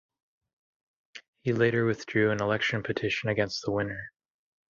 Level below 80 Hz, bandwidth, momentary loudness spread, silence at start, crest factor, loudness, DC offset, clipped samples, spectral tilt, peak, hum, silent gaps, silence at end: -60 dBFS; 7.6 kHz; 10 LU; 1.15 s; 20 dB; -28 LUFS; under 0.1%; under 0.1%; -6 dB/octave; -10 dBFS; none; 1.28-1.33 s; 0.6 s